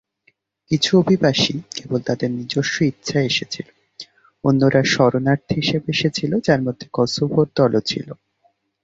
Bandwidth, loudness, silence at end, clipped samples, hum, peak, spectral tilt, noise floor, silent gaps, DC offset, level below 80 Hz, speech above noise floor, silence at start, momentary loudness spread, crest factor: 8 kHz; -19 LUFS; 0.7 s; under 0.1%; none; -2 dBFS; -5.5 dB/octave; -64 dBFS; none; under 0.1%; -54 dBFS; 45 dB; 0.7 s; 14 LU; 16 dB